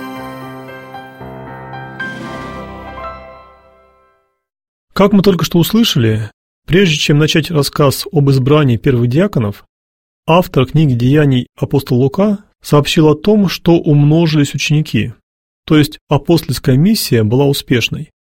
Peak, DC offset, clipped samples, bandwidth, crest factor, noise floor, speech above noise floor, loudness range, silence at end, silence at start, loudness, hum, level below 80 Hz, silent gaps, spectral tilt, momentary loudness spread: 0 dBFS; under 0.1%; under 0.1%; 16.5 kHz; 14 dB; -57 dBFS; 46 dB; 16 LU; 0.3 s; 0 s; -12 LUFS; none; -38 dBFS; 4.68-4.88 s, 6.33-6.62 s, 9.69-10.23 s, 15.23-15.63 s, 16.01-16.07 s; -6 dB/octave; 18 LU